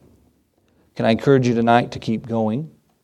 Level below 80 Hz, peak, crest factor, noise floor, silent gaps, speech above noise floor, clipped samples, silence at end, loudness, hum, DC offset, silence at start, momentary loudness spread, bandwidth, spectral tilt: -56 dBFS; 0 dBFS; 20 dB; -62 dBFS; none; 43 dB; under 0.1%; 0.35 s; -19 LUFS; none; under 0.1%; 0.95 s; 12 LU; 9.6 kHz; -7 dB/octave